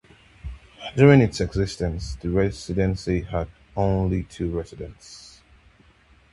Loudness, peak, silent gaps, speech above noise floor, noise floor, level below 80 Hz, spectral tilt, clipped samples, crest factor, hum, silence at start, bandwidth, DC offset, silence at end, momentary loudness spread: -23 LUFS; -2 dBFS; none; 34 dB; -56 dBFS; -38 dBFS; -7 dB/octave; under 0.1%; 22 dB; none; 0.45 s; 11.5 kHz; under 0.1%; 1.1 s; 24 LU